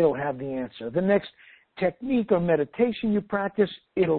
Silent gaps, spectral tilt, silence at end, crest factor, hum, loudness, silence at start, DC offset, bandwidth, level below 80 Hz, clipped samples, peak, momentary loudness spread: none; -11.5 dB/octave; 0 s; 16 dB; none; -26 LUFS; 0 s; under 0.1%; 4.5 kHz; -56 dBFS; under 0.1%; -8 dBFS; 8 LU